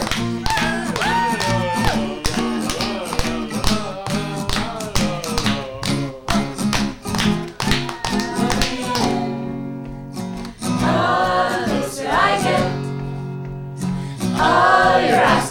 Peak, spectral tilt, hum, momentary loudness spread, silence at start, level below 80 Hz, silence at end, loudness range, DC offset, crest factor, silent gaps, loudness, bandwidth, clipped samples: 0 dBFS; -4.5 dB/octave; none; 12 LU; 0 s; -34 dBFS; 0 s; 4 LU; under 0.1%; 18 dB; none; -20 LUFS; 19.5 kHz; under 0.1%